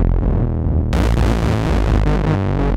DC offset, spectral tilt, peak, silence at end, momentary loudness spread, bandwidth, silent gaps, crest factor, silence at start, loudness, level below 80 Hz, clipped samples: under 0.1%; -7.5 dB/octave; -2 dBFS; 0 s; 2 LU; 11 kHz; none; 12 dB; 0 s; -18 LUFS; -18 dBFS; under 0.1%